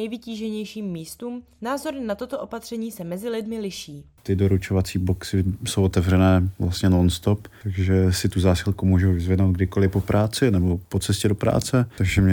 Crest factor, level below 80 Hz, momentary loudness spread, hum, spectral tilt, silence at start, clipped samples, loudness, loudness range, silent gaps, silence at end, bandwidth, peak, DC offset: 16 dB; -40 dBFS; 12 LU; none; -6.5 dB/octave; 0 s; under 0.1%; -23 LUFS; 9 LU; none; 0 s; 18.5 kHz; -6 dBFS; under 0.1%